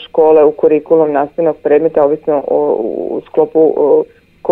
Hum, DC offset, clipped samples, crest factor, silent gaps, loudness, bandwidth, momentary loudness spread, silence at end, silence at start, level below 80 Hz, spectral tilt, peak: none; under 0.1%; under 0.1%; 12 dB; none; -12 LUFS; 3.8 kHz; 8 LU; 0 s; 0 s; -54 dBFS; -9.5 dB/octave; 0 dBFS